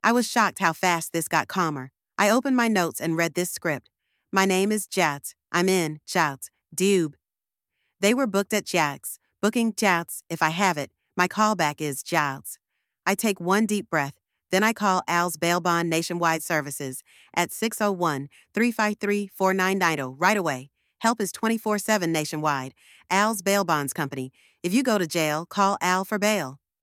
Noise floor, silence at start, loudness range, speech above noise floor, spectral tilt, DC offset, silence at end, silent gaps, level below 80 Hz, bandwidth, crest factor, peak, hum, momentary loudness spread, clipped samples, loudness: under -90 dBFS; 0.05 s; 2 LU; over 66 dB; -4 dB/octave; under 0.1%; 0.25 s; none; -72 dBFS; 18.5 kHz; 20 dB; -4 dBFS; none; 10 LU; under 0.1%; -24 LUFS